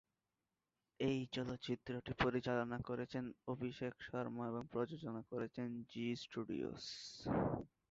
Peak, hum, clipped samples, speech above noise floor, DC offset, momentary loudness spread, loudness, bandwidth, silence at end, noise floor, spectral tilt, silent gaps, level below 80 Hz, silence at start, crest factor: -22 dBFS; none; under 0.1%; over 47 dB; under 0.1%; 7 LU; -44 LUFS; 7.6 kHz; 0.25 s; under -90 dBFS; -5 dB/octave; none; -66 dBFS; 1 s; 22 dB